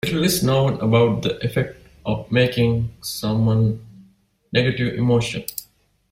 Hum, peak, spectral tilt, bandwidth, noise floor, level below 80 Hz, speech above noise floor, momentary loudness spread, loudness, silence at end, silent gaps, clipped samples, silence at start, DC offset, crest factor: none; -4 dBFS; -6 dB/octave; 16 kHz; -56 dBFS; -46 dBFS; 37 dB; 11 LU; -20 LUFS; 0.5 s; none; under 0.1%; 0.05 s; under 0.1%; 16 dB